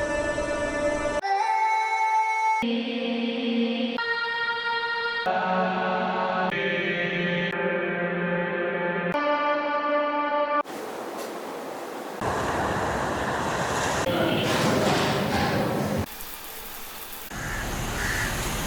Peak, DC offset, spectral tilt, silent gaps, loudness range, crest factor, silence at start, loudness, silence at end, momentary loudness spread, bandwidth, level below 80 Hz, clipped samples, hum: -10 dBFS; under 0.1%; -4.5 dB/octave; none; 4 LU; 16 dB; 0 s; -26 LUFS; 0 s; 11 LU; over 20 kHz; -46 dBFS; under 0.1%; none